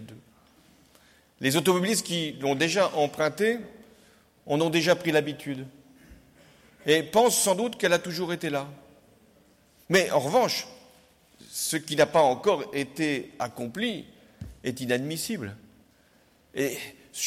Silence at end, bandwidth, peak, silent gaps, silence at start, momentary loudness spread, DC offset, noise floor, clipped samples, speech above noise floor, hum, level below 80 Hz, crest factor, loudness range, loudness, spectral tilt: 0 s; 16.5 kHz; -10 dBFS; none; 0 s; 15 LU; under 0.1%; -62 dBFS; under 0.1%; 36 dB; none; -64 dBFS; 18 dB; 6 LU; -26 LUFS; -3.5 dB/octave